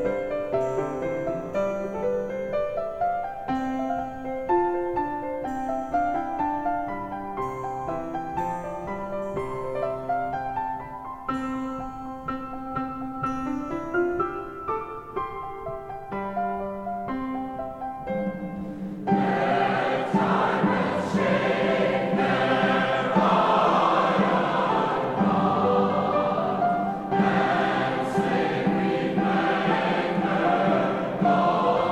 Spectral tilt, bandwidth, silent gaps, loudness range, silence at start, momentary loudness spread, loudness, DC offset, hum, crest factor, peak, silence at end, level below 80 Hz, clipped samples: -7 dB/octave; 10.5 kHz; none; 9 LU; 0 s; 11 LU; -26 LUFS; 0.1%; none; 18 dB; -8 dBFS; 0 s; -52 dBFS; under 0.1%